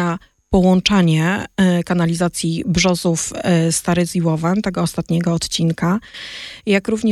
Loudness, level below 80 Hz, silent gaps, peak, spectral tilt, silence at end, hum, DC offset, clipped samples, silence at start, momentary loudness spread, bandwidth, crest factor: -17 LUFS; -40 dBFS; none; -2 dBFS; -5 dB/octave; 0 s; none; under 0.1%; under 0.1%; 0 s; 8 LU; 13.5 kHz; 16 dB